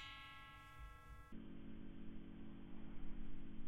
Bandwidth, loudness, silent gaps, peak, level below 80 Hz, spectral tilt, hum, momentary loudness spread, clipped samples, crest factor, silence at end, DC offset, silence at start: 4.9 kHz; -57 LUFS; none; -34 dBFS; -56 dBFS; -6 dB/octave; none; 3 LU; under 0.1%; 12 dB; 0 s; under 0.1%; 0 s